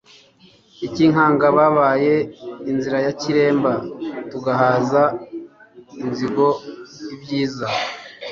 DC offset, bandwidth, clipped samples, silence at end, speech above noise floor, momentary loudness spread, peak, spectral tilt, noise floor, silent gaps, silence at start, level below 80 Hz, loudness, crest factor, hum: under 0.1%; 7.4 kHz; under 0.1%; 0 s; 34 dB; 17 LU; -2 dBFS; -6.5 dB/octave; -52 dBFS; none; 0.8 s; -58 dBFS; -19 LUFS; 16 dB; none